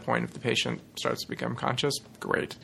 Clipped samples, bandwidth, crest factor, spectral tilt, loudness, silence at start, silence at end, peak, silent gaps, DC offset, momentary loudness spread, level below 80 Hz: under 0.1%; 15 kHz; 22 dB; -4 dB/octave; -30 LUFS; 0 s; 0 s; -8 dBFS; none; under 0.1%; 5 LU; -62 dBFS